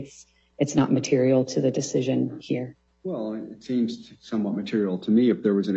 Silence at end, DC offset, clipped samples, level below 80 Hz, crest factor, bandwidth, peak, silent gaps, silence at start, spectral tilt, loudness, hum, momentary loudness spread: 0 s; under 0.1%; under 0.1%; -64 dBFS; 16 dB; 8.2 kHz; -8 dBFS; none; 0 s; -6.5 dB/octave; -25 LUFS; none; 13 LU